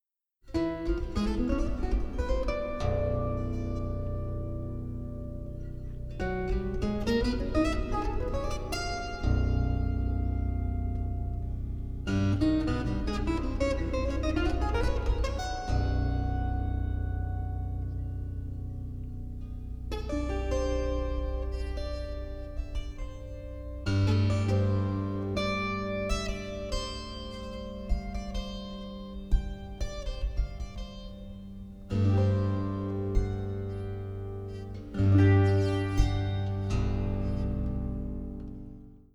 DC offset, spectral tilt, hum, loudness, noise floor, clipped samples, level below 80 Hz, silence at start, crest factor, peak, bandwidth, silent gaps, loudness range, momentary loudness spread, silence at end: under 0.1%; -7 dB/octave; none; -32 LUFS; -57 dBFS; under 0.1%; -34 dBFS; 0.45 s; 18 dB; -10 dBFS; 11 kHz; none; 8 LU; 13 LU; 0.15 s